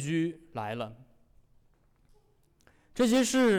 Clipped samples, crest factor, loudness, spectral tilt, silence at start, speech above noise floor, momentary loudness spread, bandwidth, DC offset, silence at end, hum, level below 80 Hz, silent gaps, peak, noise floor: under 0.1%; 14 dB; -29 LUFS; -4.5 dB/octave; 0 s; 38 dB; 16 LU; 17 kHz; under 0.1%; 0 s; none; -62 dBFS; none; -18 dBFS; -66 dBFS